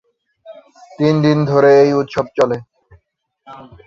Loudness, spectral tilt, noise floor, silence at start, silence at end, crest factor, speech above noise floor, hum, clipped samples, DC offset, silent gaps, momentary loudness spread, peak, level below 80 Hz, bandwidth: -14 LUFS; -7.5 dB/octave; -63 dBFS; 0.45 s; 0.25 s; 16 dB; 50 dB; none; under 0.1%; under 0.1%; none; 9 LU; -2 dBFS; -54 dBFS; 7.4 kHz